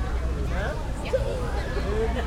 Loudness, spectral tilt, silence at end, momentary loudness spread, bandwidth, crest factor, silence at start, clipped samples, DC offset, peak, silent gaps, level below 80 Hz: -29 LUFS; -6.5 dB/octave; 0 s; 3 LU; 12.5 kHz; 14 dB; 0 s; under 0.1%; under 0.1%; -12 dBFS; none; -28 dBFS